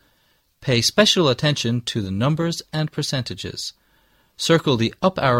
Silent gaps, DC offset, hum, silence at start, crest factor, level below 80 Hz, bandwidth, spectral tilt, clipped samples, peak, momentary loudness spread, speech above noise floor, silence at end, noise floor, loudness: none; under 0.1%; none; 0.6 s; 20 dB; -52 dBFS; 16.5 kHz; -4.5 dB/octave; under 0.1%; -2 dBFS; 13 LU; 43 dB; 0 s; -63 dBFS; -20 LUFS